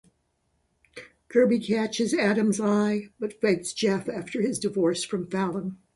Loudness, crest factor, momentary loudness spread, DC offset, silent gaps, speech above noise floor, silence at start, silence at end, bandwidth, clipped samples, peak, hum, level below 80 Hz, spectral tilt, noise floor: -26 LUFS; 18 dB; 10 LU; under 0.1%; none; 47 dB; 0.95 s; 0.2 s; 11.5 kHz; under 0.1%; -8 dBFS; none; -66 dBFS; -5 dB/octave; -72 dBFS